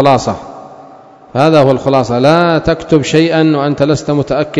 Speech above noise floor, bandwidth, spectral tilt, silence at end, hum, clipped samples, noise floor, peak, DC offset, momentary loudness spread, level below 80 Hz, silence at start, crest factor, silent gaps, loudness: 27 dB; 11 kHz; -6.5 dB/octave; 0 s; none; 0.8%; -37 dBFS; 0 dBFS; under 0.1%; 8 LU; -40 dBFS; 0 s; 12 dB; none; -11 LUFS